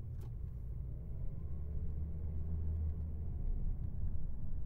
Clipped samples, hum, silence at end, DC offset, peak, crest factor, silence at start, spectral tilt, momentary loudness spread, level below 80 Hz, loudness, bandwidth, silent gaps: under 0.1%; none; 0 s; under 0.1%; -26 dBFS; 12 dB; 0 s; -11 dB/octave; 6 LU; -42 dBFS; -44 LUFS; 1.7 kHz; none